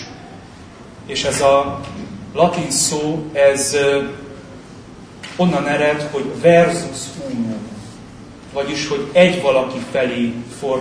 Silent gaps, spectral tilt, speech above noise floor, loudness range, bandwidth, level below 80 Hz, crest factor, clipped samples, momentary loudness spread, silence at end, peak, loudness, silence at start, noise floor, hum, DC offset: none; -4 dB/octave; 22 dB; 2 LU; 11 kHz; -48 dBFS; 18 dB; under 0.1%; 24 LU; 0 s; 0 dBFS; -17 LUFS; 0 s; -38 dBFS; none; under 0.1%